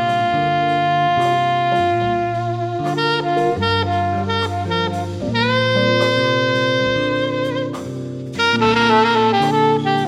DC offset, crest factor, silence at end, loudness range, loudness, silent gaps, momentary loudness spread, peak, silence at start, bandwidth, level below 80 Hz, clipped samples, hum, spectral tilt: under 0.1%; 14 dB; 0 s; 2 LU; -17 LUFS; none; 7 LU; -2 dBFS; 0 s; 12.5 kHz; -48 dBFS; under 0.1%; none; -5.5 dB/octave